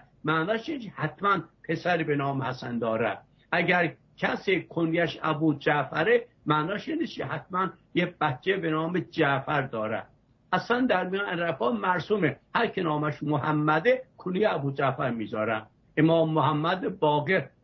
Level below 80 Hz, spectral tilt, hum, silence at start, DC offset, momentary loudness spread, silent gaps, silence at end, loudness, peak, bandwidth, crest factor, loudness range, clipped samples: -64 dBFS; -7.5 dB/octave; none; 0.25 s; under 0.1%; 7 LU; none; 0.15 s; -27 LUFS; -10 dBFS; 6.2 kHz; 18 dB; 2 LU; under 0.1%